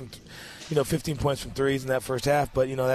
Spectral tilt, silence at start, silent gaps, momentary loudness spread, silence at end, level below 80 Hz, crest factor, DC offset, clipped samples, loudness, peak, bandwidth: -5.5 dB/octave; 0 s; none; 17 LU; 0 s; -46 dBFS; 16 dB; under 0.1%; under 0.1%; -27 LUFS; -10 dBFS; 14 kHz